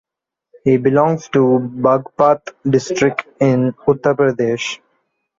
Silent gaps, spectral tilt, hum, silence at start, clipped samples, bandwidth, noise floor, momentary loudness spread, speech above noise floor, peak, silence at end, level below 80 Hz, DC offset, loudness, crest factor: none; -6.5 dB/octave; none; 0.65 s; under 0.1%; 7.6 kHz; -70 dBFS; 5 LU; 55 dB; -2 dBFS; 0.65 s; -56 dBFS; under 0.1%; -16 LUFS; 14 dB